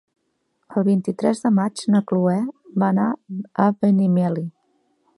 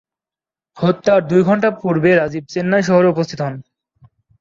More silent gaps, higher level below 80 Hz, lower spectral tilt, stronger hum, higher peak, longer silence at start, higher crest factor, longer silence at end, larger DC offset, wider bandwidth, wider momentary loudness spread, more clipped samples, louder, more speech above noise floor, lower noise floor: neither; second, -68 dBFS vs -56 dBFS; about the same, -8 dB/octave vs -7 dB/octave; neither; about the same, -2 dBFS vs -2 dBFS; about the same, 0.7 s vs 0.75 s; about the same, 18 dB vs 16 dB; second, 0.65 s vs 0.8 s; neither; first, 11.5 kHz vs 7.6 kHz; about the same, 10 LU vs 9 LU; neither; second, -21 LUFS vs -16 LUFS; second, 52 dB vs 75 dB; second, -71 dBFS vs -90 dBFS